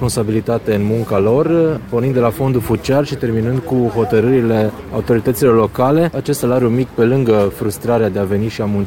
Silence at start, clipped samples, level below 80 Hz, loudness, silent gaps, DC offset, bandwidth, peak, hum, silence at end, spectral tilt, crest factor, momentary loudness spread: 0 s; under 0.1%; -40 dBFS; -15 LUFS; none; 0.2%; 17 kHz; -2 dBFS; none; 0 s; -7 dB/octave; 14 dB; 5 LU